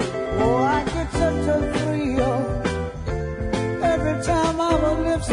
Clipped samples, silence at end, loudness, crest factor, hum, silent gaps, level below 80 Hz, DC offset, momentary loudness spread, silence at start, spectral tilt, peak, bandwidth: under 0.1%; 0 s; -22 LUFS; 14 dB; none; none; -34 dBFS; under 0.1%; 6 LU; 0 s; -6 dB/octave; -8 dBFS; 11 kHz